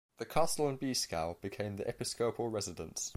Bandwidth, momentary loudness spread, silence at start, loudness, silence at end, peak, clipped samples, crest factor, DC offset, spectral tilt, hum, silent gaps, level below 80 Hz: 16 kHz; 7 LU; 0.1 s; -36 LUFS; 0 s; -16 dBFS; under 0.1%; 20 dB; under 0.1%; -3.5 dB/octave; none; none; -60 dBFS